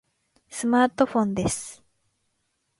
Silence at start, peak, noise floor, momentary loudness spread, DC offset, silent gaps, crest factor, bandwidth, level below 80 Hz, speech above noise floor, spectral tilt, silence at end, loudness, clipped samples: 0.5 s; -8 dBFS; -75 dBFS; 15 LU; under 0.1%; none; 18 dB; 11.5 kHz; -54 dBFS; 52 dB; -5 dB/octave; 1.05 s; -24 LUFS; under 0.1%